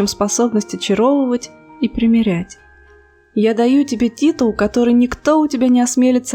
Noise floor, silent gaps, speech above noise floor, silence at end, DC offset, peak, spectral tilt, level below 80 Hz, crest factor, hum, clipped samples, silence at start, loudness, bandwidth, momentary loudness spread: -48 dBFS; none; 33 dB; 0 s; under 0.1%; 0 dBFS; -5 dB/octave; -44 dBFS; 14 dB; none; under 0.1%; 0 s; -15 LUFS; 15 kHz; 9 LU